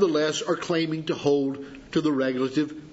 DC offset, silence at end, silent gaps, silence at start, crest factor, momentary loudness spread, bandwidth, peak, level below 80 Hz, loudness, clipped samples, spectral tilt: under 0.1%; 0 s; none; 0 s; 16 dB; 5 LU; 8 kHz; -8 dBFS; -62 dBFS; -26 LUFS; under 0.1%; -5 dB/octave